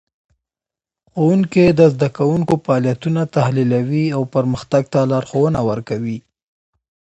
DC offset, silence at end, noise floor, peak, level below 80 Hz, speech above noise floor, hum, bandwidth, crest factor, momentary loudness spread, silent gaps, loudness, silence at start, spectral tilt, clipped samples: under 0.1%; 0.8 s; -89 dBFS; 0 dBFS; -50 dBFS; 73 dB; none; 8.4 kHz; 16 dB; 9 LU; none; -17 LUFS; 1.15 s; -8 dB/octave; under 0.1%